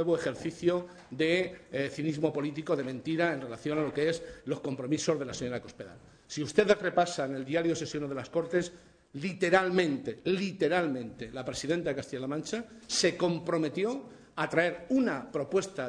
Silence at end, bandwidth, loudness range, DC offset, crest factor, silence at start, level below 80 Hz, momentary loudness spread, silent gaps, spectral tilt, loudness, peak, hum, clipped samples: 0 s; 10 kHz; 2 LU; under 0.1%; 20 dB; 0 s; -64 dBFS; 11 LU; none; -5 dB/octave; -31 LUFS; -12 dBFS; none; under 0.1%